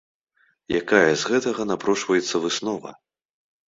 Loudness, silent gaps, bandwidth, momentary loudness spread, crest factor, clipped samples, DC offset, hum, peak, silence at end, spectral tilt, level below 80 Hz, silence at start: -22 LUFS; none; 8 kHz; 11 LU; 22 dB; under 0.1%; under 0.1%; none; -2 dBFS; 0.75 s; -3.5 dB/octave; -60 dBFS; 0.7 s